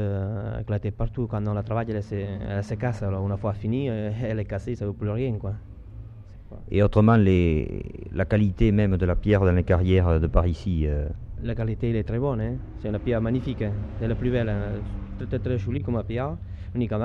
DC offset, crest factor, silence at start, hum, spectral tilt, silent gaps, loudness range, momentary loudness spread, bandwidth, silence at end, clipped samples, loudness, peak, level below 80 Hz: under 0.1%; 22 dB; 0 s; none; -9.5 dB/octave; none; 6 LU; 13 LU; 6.8 kHz; 0 s; under 0.1%; -26 LUFS; -2 dBFS; -34 dBFS